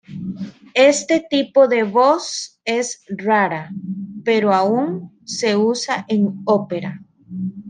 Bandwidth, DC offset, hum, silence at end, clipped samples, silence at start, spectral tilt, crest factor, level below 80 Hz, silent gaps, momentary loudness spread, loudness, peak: 9.8 kHz; under 0.1%; none; 0 s; under 0.1%; 0.1 s; -4.5 dB/octave; 16 dB; -66 dBFS; none; 15 LU; -18 LUFS; -2 dBFS